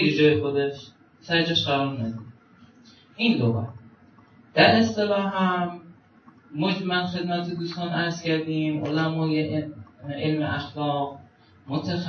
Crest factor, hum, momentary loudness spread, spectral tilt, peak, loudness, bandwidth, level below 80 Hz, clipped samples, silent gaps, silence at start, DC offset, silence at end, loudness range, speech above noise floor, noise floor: 22 dB; none; 13 LU; -6.5 dB/octave; -2 dBFS; -24 LUFS; 6.8 kHz; -64 dBFS; under 0.1%; none; 0 s; under 0.1%; 0 s; 4 LU; 30 dB; -54 dBFS